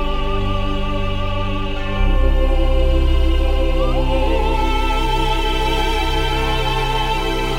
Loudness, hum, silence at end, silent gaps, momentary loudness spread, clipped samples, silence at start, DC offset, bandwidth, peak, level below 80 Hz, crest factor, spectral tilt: -19 LUFS; none; 0 s; none; 4 LU; under 0.1%; 0 s; under 0.1%; 15 kHz; -4 dBFS; -18 dBFS; 12 dB; -5.5 dB/octave